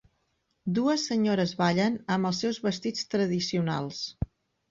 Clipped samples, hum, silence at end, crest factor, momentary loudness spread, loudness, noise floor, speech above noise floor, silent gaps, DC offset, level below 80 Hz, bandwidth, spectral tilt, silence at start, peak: under 0.1%; none; 0.45 s; 16 dB; 9 LU; -28 LUFS; -75 dBFS; 48 dB; none; under 0.1%; -52 dBFS; 7.6 kHz; -5.5 dB/octave; 0.65 s; -12 dBFS